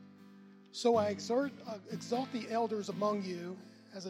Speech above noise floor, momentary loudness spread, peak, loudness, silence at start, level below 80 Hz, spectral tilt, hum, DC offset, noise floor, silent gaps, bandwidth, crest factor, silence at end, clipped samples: 22 dB; 15 LU; -18 dBFS; -35 LUFS; 0 s; -88 dBFS; -5 dB/octave; none; under 0.1%; -57 dBFS; none; 15 kHz; 18 dB; 0 s; under 0.1%